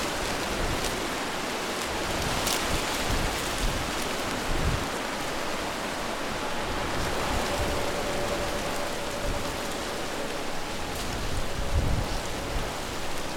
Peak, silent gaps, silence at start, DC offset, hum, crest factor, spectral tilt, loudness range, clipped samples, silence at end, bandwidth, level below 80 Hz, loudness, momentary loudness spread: -6 dBFS; none; 0 s; under 0.1%; none; 22 dB; -3.5 dB/octave; 3 LU; under 0.1%; 0 s; 18.5 kHz; -36 dBFS; -29 LUFS; 5 LU